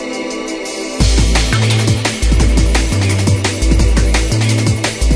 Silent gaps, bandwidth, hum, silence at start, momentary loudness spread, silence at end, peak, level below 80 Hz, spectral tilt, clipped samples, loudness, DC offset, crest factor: none; 11 kHz; none; 0 s; 8 LU; 0 s; 0 dBFS; -16 dBFS; -4.5 dB/octave; under 0.1%; -14 LUFS; under 0.1%; 12 dB